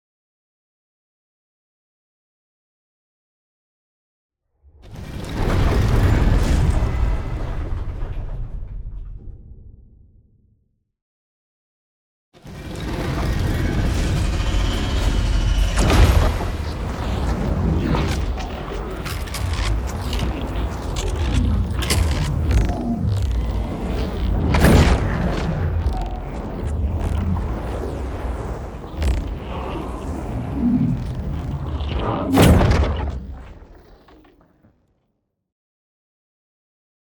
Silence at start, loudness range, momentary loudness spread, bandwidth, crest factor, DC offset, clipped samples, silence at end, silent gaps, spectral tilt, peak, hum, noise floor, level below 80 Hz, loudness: 4.85 s; 11 LU; 14 LU; over 20 kHz; 20 dB; under 0.1%; under 0.1%; 3.25 s; 11.02-12.32 s; -6 dB/octave; -2 dBFS; none; -72 dBFS; -24 dBFS; -22 LUFS